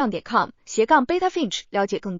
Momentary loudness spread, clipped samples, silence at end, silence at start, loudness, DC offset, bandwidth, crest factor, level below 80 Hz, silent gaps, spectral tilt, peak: 7 LU; under 0.1%; 0 s; 0 s; -22 LUFS; under 0.1%; 7.6 kHz; 18 dB; -56 dBFS; none; -4 dB/octave; -4 dBFS